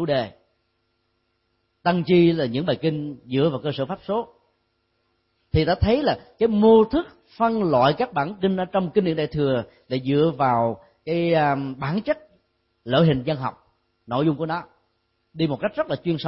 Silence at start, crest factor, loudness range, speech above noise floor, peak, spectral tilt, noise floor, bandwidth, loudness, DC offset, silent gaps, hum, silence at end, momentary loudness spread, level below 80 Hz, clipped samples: 0 s; 18 dB; 5 LU; 50 dB; -6 dBFS; -11.5 dB/octave; -71 dBFS; 5.8 kHz; -22 LUFS; under 0.1%; none; none; 0 s; 11 LU; -46 dBFS; under 0.1%